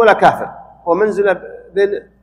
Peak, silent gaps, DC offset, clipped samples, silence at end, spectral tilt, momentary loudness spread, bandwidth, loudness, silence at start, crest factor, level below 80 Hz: 0 dBFS; none; under 0.1%; 0.2%; 0.2 s; -6 dB/octave; 13 LU; 12 kHz; -15 LUFS; 0 s; 14 dB; -52 dBFS